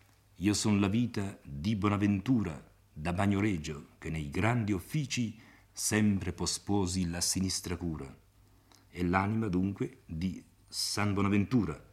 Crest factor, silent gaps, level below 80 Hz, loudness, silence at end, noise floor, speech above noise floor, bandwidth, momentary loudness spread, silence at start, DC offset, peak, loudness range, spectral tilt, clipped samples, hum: 22 dB; none; -56 dBFS; -32 LUFS; 0.1 s; -62 dBFS; 31 dB; 15.5 kHz; 11 LU; 0.4 s; under 0.1%; -10 dBFS; 2 LU; -5 dB/octave; under 0.1%; none